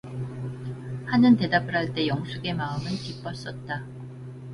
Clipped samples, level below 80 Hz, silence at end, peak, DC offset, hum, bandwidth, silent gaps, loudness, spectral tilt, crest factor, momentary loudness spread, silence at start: under 0.1%; -54 dBFS; 0 s; -8 dBFS; under 0.1%; none; 11 kHz; none; -26 LUFS; -7 dB/octave; 18 dB; 17 LU; 0.05 s